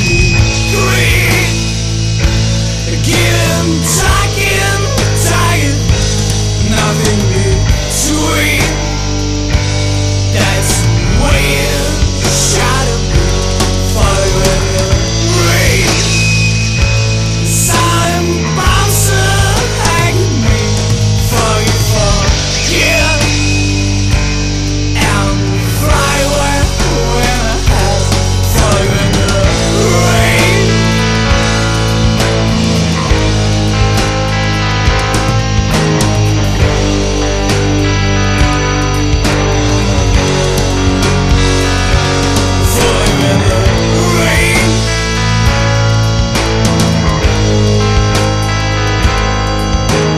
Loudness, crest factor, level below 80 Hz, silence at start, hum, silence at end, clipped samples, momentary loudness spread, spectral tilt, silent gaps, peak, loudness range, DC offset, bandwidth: -11 LUFS; 10 dB; -18 dBFS; 0 s; none; 0 s; under 0.1%; 4 LU; -4.5 dB/octave; none; 0 dBFS; 2 LU; 1%; 14 kHz